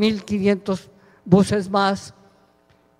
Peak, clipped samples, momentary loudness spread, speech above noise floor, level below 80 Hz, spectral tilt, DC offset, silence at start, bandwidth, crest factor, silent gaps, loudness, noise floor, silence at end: -2 dBFS; under 0.1%; 12 LU; 39 dB; -52 dBFS; -6.5 dB/octave; under 0.1%; 0 s; 12 kHz; 20 dB; none; -20 LUFS; -58 dBFS; 0.9 s